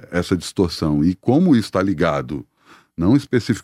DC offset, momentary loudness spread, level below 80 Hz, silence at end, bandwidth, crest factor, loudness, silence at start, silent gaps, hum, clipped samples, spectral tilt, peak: under 0.1%; 9 LU; -42 dBFS; 0 s; 14.5 kHz; 16 dB; -19 LUFS; 0.1 s; none; none; under 0.1%; -7 dB/octave; -4 dBFS